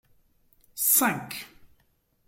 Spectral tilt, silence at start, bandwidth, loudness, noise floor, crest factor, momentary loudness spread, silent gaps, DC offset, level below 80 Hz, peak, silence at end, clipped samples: -2 dB/octave; 0.75 s; 17 kHz; -23 LUFS; -68 dBFS; 22 dB; 19 LU; none; under 0.1%; -68 dBFS; -8 dBFS; 0.8 s; under 0.1%